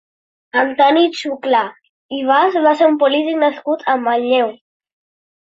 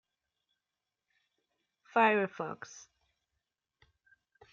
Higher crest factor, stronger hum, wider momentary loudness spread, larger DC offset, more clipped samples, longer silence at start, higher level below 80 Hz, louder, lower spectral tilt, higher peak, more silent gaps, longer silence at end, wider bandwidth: second, 14 dB vs 24 dB; neither; second, 10 LU vs 22 LU; neither; neither; second, 0.55 s vs 1.95 s; first, -68 dBFS vs -84 dBFS; first, -15 LUFS vs -30 LUFS; about the same, -4 dB/octave vs -5 dB/octave; first, -2 dBFS vs -14 dBFS; first, 1.89-2.09 s vs none; second, 1.05 s vs 1.7 s; about the same, 8 kHz vs 7.6 kHz